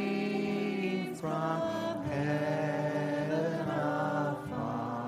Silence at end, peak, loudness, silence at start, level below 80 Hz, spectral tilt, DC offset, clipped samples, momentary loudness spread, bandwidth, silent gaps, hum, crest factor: 0 s; -18 dBFS; -33 LUFS; 0 s; -66 dBFS; -7 dB/octave; under 0.1%; under 0.1%; 4 LU; 15.5 kHz; none; none; 14 dB